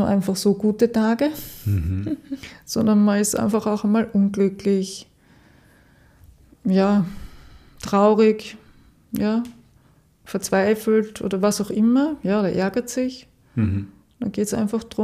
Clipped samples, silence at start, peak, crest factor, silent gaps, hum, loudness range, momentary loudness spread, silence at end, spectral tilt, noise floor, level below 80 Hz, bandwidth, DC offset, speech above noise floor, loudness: under 0.1%; 0 s; -4 dBFS; 18 dB; none; none; 3 LU; 13 LU; 0 s; -6 dB/octave; -56 dBFS; -48 dBFS; 15.5 kHz; under 0.1%; 36 dB; -21 LUFS